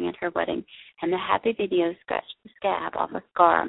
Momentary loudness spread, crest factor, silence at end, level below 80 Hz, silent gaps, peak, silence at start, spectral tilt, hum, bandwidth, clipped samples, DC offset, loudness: 9 LU; 22 dB; 0 s; -62 dBFS; none; -4 dBFS; 0 s; -9.5 dB/octave; none; 4.1 kHz; under 0.1%; under 0.1%; -26 LUFS